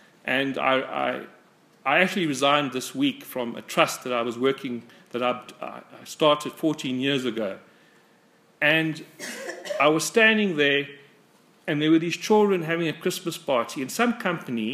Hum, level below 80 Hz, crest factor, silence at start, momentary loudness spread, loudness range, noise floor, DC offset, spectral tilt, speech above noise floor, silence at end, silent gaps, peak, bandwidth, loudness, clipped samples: none; -78 dBFS; 24 dB; 0.25 s; 14 LU; 5 LU; -59 dBFS; under 0.1%; -4 dB/octave; 35 dB; 0 s; none; -2 dBFS; 15.5 kHz; -24 LUFS; under 0.1%